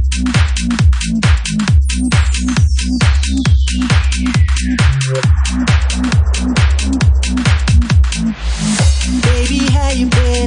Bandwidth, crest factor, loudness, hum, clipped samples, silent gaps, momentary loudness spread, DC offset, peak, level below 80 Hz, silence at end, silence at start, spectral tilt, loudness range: 10.5 kHz; 10 dB; -13 LUFS; none; under 0.1%; none; 2 LU; under 0.1%; 0 dBFS; -16 dBFS; 0 s; 0 s; -5 dB/octave; 0 LU